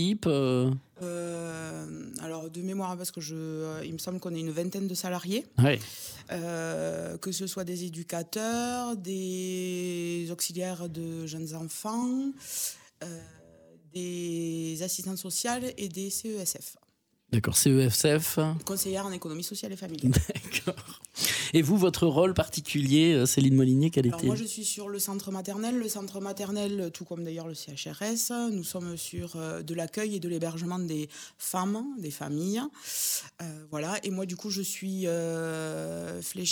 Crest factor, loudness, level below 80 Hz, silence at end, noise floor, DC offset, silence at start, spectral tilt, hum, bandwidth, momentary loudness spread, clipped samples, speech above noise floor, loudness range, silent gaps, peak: 24 dB; -30 LUFS; -54 dBFS; 0 s; -69 dBFS; under 0.1%; 0 s; -4.5 dB/octave; none; over 20 kHz; 13 LU; under 0.1%; 39 dB; 9 LU; none; -6 dBFS